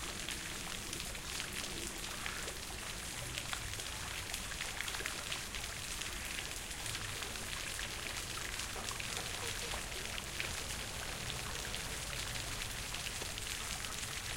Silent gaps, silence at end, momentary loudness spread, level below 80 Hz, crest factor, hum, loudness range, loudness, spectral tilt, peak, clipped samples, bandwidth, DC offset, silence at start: none; 0 s; 2 LU; -52 dBFS; 24 dB; none; 1 LU; -40 LUFS; -1.5 dB/octave; -18 dBFS; under 0.1%; 17 kHz; under 0.1%; 0 s